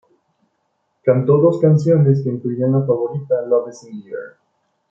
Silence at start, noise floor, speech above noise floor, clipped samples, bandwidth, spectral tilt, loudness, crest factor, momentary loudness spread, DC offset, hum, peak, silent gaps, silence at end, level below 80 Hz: 1.05 s; -69 dBFS; 53 dB; under 0.1%; 7.4 kHz; -10 dB/octave; -16 LUFS; 16 dB; 18 LU; under 0.1%; none; -2 dBFS; none; 0.6 s; -62 dBFS